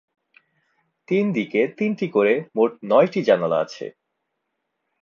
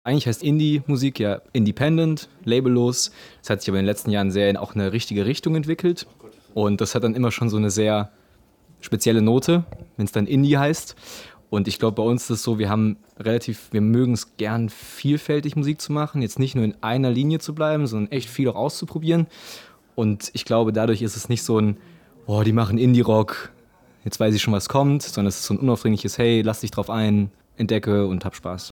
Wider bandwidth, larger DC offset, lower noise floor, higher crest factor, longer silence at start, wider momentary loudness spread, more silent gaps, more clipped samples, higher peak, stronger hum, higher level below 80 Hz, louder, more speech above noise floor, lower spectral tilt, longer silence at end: second, 7.2 kHz vs 18.5 kHz; neither; first, -77 dBFS vs -56 dBFS; about the same, 18 dB vs 18 dB; first, 1.1 s vs 0.05 s; second, 6 LU vs 10 LU; neither; neither; about the same, -4 dBFS vs -4 dBFS; neither; second, -74 dBFS vs -54 dBFS; about the same, -21 LUFS vs -22 LUFS; first, 57 dB vs 35 dB; about the same, -7 dB/octave vs -6 dB/octave; first, 1.15 s vs 0.05 s